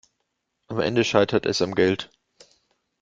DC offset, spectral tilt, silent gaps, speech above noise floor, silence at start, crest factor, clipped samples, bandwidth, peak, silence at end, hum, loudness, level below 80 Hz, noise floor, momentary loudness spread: under 0.1%; -5 dB/octave; none; 55 dB; 0.7 s; 22 dB; under 0.1%; 7.8 kHz; -2 dBFS; 0.95 s; none; -23 LUFS; -58 dBFS; -77 dBFS; 11 LU